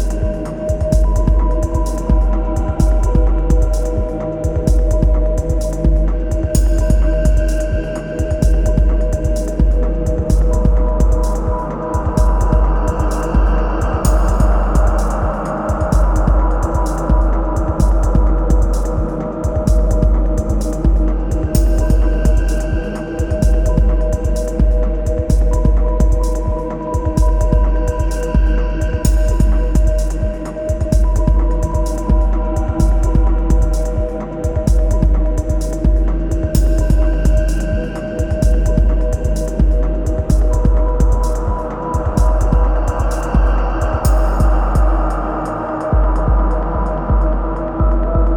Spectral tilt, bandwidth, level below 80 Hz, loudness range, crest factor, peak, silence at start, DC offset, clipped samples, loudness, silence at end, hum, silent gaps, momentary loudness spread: -7.5 dB/octave; 13 kHz; -14 dBFS; 1 LU; 12 dB; 0 dBFS; 0 s; under 0.1%; under 0.1%; -17 LUFS; 0 s; none; none; 5 LU